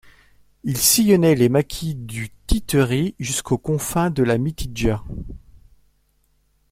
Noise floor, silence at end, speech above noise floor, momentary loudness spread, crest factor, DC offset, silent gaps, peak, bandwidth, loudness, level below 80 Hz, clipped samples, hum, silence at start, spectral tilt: -63 dBFS; 1.35 s; 44 dB; 16 LU; 18 dB; under 0.1%; none; -2 dBFS; 16.5 kHz; -20 LUFS; -34 dBFS; under 0.1%; none; 0.65 s; -4.5 dB/octave